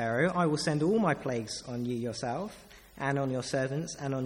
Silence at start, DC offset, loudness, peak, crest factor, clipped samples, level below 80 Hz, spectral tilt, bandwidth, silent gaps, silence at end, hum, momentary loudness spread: 0 s; under 0.1%; -31 LUFS; -14 dBFS; 16 dB; under 0.1%; -60 dBFS; -5.5 dB/octave; 16.5 kHz; none; 0 s; none; 9 LU